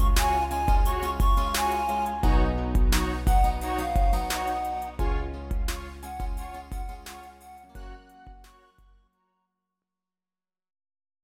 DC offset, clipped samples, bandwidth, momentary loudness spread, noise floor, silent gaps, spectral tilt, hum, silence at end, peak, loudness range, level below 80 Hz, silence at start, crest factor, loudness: under 0.1%; under 0.1%; 17 kHz; 18 LU; under -90 dBFS; none; -5 dB/octave; none; 2.8 s; -10 dBFS; 17 LU; -28 dBFS; 0 s; 16 dB; -27 LUFS